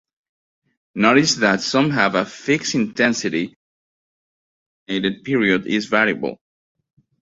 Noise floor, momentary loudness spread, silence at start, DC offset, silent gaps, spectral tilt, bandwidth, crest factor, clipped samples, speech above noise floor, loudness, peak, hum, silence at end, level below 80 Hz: under -90 dBFS; 11 LU; 0.95 s; under 0.1%; 3.56-4.86 s; -4 dB/octave; 8 kHz; 20 dB; under 0.1%; over 71 dB; -19 LUFS; 0 dBFS; none; 0.9 s; -60 dBFS